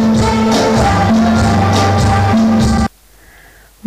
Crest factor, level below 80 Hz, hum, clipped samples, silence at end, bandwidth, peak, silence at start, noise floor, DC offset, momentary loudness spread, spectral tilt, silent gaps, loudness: 6 dB; -26 dBFS; none; under 0.1%; 1 s; 15 kHz; -6 dBFS; 0 s; -43 dBFS; under 0.1%; 2 LU; -6 dB/octave; none; -12 LUFS